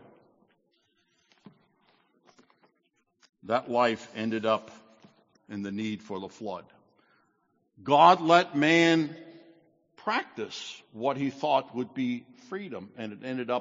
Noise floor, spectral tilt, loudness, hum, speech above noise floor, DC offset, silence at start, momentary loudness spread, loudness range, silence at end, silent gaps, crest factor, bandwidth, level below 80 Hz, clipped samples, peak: -74 dBFS; -3 dB/octave; -27 LUFS; none; 47 dB; under 0.1%; 3.45 s; 19 LU; 10 LU; 0 s; none; 24 dB; 7.6 kHz; -78 dBFS; under 0.1%; -6 dBFS